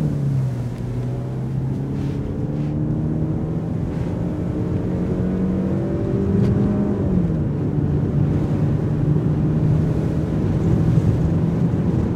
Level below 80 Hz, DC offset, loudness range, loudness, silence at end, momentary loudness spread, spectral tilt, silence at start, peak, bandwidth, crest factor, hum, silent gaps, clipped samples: -34 dBFS; under 0.1%; 4 LU; -21 LUFS; 0 s; 6 LU; -10 dB/octave; 0 s; -4 dBFS; 8 kHz; 14 dB; none; none; under 0.1%